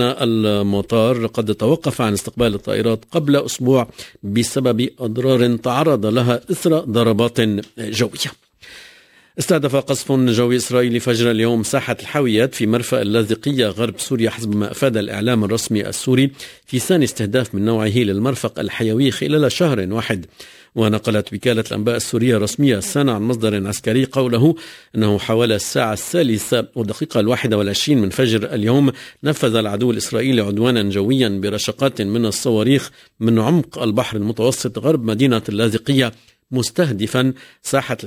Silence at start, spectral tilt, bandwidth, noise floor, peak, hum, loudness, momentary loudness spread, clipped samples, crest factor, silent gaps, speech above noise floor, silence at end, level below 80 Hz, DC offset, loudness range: 0 s; -5.5 dB/octave; 16 kHz; -49 dBFS; -2 dBFS; none; -18 LUFS; 5 LU; under 0.1%; 16 dB; none; 31 dB; 0 s; -48 dBFS; under 0.1%; 2 LU